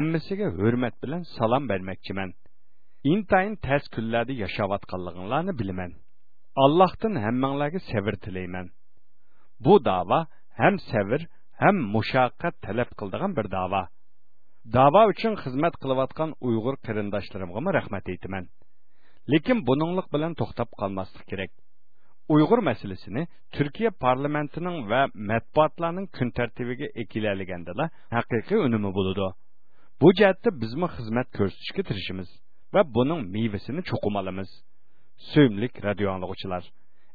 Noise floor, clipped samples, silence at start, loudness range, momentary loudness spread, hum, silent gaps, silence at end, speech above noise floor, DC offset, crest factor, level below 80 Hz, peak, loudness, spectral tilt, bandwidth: -75 dBFS; under 0.1%; 0 s; 4 LU; 13 LU; none; none; 0.55 s; 50 dB; 1%; 22 dB; -54 dBFS; -4 dBFS; -26 LUFS; -9.5 dB/octave; 4.9 kHz